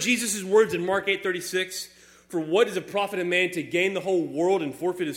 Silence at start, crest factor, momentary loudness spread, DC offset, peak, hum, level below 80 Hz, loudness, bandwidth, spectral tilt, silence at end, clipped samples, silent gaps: 0 s; 18 dB; 8 LU; under 0.1%; -8 dBFS; none; -68 dBFS; -25 LUFS; 17 kHz; -3.5 dB/octave; 0 s; under 0.1%; none